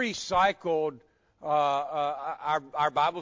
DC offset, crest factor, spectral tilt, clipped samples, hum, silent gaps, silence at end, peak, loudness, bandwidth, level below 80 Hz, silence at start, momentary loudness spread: under 0.1%; 18 dB; -3.5 dB/octave; under 0.1%; none; none; 0 s; -12 dBFS; -28 LUFS; 7.6 kHz; -62 dBFS; 0 s; 7 LU